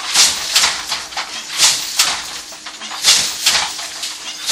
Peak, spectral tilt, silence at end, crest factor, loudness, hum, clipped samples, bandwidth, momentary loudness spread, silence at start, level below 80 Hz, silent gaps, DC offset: 0 dBFS; 2.5 dB/octave; 0 s; 18 dB; -14 LUFS; none; under 0.1%; over 20 kHz; 15 LU; 0 s; -52 dBFS; none; under 0.1%